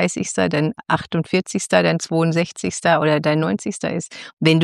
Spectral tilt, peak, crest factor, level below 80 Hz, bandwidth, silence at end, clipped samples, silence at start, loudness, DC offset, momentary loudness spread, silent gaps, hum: -5 dB/octave; -2 dBFS; 18 dB; -56 dBFS; 12 kHz; 0 s; under 0.1%; 0 s; -20 LUFS; under 0.1%; 7 LU; 4.33-4.37 s; none